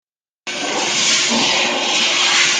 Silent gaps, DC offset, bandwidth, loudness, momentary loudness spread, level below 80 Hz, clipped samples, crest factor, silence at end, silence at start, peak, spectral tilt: none; under 0.1%; 14 kHz; -14 LUFS; 11 LU; -64 dBFS; under 0.1%; 16 dB; 0 s; 0.45 s; -2 dBFS; 0 dB/octave